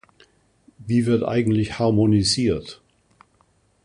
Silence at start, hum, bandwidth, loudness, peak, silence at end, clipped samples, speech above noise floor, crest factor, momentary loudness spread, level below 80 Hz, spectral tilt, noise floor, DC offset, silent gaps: 0.8 s; none; 11 kHz; -20 LUFS; -8 dBFS; 1.1 s; under 0.1%; 42 dB; 16 dB; 11 LU; -46 dBFS; -6 dB/octave; -62 dBFS; under 0.1%; none